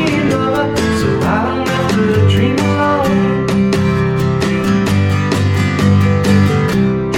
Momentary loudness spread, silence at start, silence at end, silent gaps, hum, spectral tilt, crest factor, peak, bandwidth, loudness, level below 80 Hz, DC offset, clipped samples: 3 LU; 0 s; 0 s; none; none; -6.5 dB/octave; 12 dB; 0 dBFS; 15.5 kHz; -13 LUFS; -34 dBFS; under 0.1%; under 0.1%